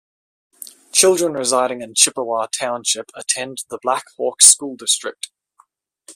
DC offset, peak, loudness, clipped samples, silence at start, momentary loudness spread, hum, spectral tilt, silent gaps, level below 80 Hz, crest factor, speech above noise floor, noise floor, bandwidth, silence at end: under 0.1%; 0 dBFS; -16 LUFS; under 0.1%; 0.95 s; 19 LU; none; -0.5 dB/octave; none; -68 dBFS; 20 dB; 39 dB; -57 dBFS; 16 kHz; 0.05 s